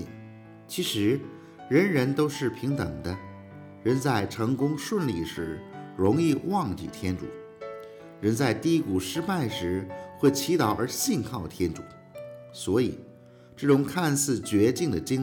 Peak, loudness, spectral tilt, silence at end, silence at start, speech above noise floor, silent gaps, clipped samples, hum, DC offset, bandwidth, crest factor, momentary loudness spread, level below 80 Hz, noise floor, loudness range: -8 dBFS; -27 LUFS; -5.5 dB/octave; 0 s; 0 s; 25 dB; none; under 0.1%; none; under 0.1%; over 20 kHz; 20 dB; 18 LU; -60 dBFS; -51 dBFS; 2 LU